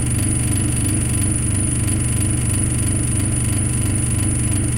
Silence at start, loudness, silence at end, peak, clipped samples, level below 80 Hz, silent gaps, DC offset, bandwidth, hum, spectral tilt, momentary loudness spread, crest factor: 0 s; -18 LUFS; 0 s; -6 dBFS; under 0.1%; -26 dBFS; none; under 0.1%; 16.5 kHz; 50 Hz at -25 dBFS; -4.5 dB/octave; 1 LU; 12 dB